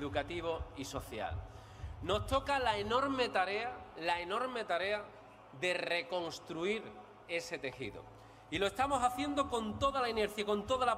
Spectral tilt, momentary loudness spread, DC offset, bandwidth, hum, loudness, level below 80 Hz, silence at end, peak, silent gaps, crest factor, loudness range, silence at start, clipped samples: -4 dB/octave; 13 LU; under 0.1%; 16 kHz; none; -36 LUFS; -56 dBFS; 0 s; -18 dBFS; none; 18 dB; 4 LU; 0 s; under 0.1%